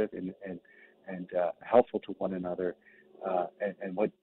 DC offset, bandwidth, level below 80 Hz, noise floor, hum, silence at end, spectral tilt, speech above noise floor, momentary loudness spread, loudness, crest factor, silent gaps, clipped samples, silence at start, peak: under 0.1%; 4.1 kHz; -70 dBFS; -59 dBFS; none; 0.1 s; -6 dB/octave; 28 dB; 18 LU; -32 LUFS; 22 dB; none; under 0.1%; 0 s; -10 dBFS